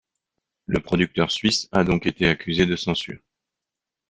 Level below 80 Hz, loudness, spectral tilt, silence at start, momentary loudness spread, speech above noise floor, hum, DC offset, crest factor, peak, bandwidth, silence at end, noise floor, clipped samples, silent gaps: -46 dBFS; -22 LUFS; -5 dB/octave; 0.7 s; 9 LU; 65 dB; none; under 0.1%; 22 dB; -2 dBFS; 9.6 kHz; 0.95 s; -87 dBFS; under 0.1%; none